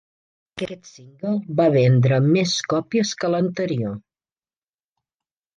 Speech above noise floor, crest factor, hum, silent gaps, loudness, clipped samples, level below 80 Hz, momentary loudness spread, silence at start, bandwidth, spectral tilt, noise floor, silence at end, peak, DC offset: over 70 dB; 16 dB; none; none; -20 LUFS; under 0.1%; -62 dBFS; 15 LU; 0.55 s; 9.2 kHz; -6 dB/octave; under -90 dBFS; 1.6 s; -6 dBFS; under 0.1%